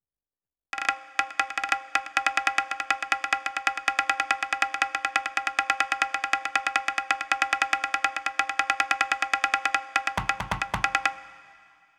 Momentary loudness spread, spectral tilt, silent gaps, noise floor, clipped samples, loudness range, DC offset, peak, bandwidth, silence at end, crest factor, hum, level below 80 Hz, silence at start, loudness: 4 LU; -1 dB/octave; none; under -90 dBFS; under 0.1%; 1 LU; under 0.1%; -6 dBFS; 15.5 kHz; 0.55 s; 22 dB; none; -54 dBFS; 0.75 s; -26 LUFS